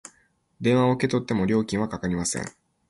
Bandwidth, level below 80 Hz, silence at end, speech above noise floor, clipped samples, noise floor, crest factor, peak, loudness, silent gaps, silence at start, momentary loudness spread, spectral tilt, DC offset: 11.5 kHz; -52 dBFS; 0.4 s; 41 dB; under 0.1%; -65 dBFS; 16 dB; -8 dBFS; -24 LUFS; none; 0.6 s; 7 LU; -5.5 dB/octave; under 0.1%